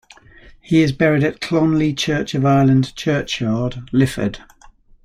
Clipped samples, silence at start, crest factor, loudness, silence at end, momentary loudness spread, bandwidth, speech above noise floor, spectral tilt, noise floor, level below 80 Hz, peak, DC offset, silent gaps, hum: under 0.1%; 0.5 s; 16 dB; -18 LUFS; 0.35 s; 7 LU; 14 kHz; 30 dB; -6.5 dB/octave; -47 dBFS; -44 dBFS; -2 dBFS; under 0.1%; none; none